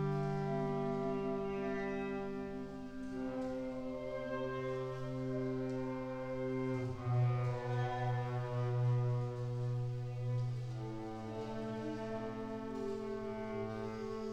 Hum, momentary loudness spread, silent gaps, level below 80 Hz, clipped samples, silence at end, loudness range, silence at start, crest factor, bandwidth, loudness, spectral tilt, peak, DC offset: none; 8 LU; none; -60 dBFS; under 0.1%; 0 s; 5 LU; 0 s; 12 dB; 8.4 kHz; -39 LUFS; -8.5 dB/octave; -26 dBFS; under 0.1%